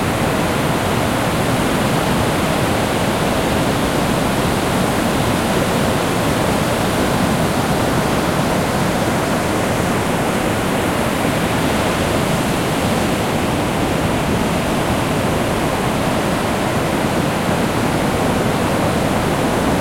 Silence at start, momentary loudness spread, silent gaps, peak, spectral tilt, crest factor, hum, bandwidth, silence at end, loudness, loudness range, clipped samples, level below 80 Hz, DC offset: 0 s; 1 LU; none; -4 dBFS; -5 dB/octave; 14 dB; none; 16.5 kHz; 0 s; -17 LUFS; 1 LU; under 0.1%; -34 dBFS; under 0.1%